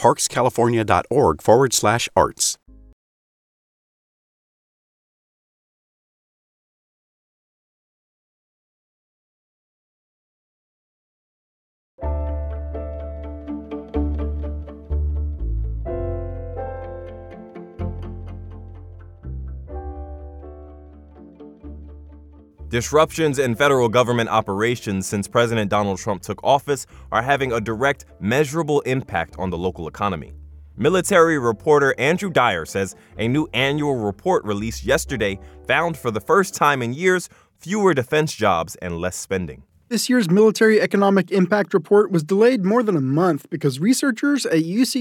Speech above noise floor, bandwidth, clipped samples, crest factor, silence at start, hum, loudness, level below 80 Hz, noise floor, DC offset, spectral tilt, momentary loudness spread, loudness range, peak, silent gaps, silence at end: 25 dB; 17.5 kHz; under 0.1%; 20 dB; 0 s; none; -20 LUFS; -38 dBFS; -44 dBFS; under 0.1%; -5 dB/octave; 18 LU; 16 LU; -2 dBFS; 2.93-11.98 s; 0 s